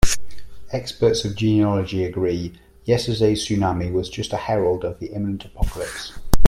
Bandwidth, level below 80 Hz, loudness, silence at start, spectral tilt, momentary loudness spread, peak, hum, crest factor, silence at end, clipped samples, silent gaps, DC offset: 16 kHz; -30 dBFS; -23 LUFS; 0 s; -5.5 dB/octave; 10 LU; 0 dBFS; none; 18 dB; 0 s; under 0.1%; none; under 0.1%